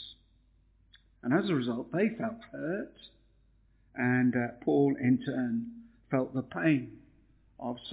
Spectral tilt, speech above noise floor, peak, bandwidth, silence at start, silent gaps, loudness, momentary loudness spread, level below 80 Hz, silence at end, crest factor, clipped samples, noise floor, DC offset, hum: -6.5 dB/octave; 35 dB; -14 dBFS; 4 kHz; 0 s; none; -31 LUFS; 14 LU; -66 dBFS; 0 s; 18 dB; under 0.1%; -65 dBFS; under 0.1%; none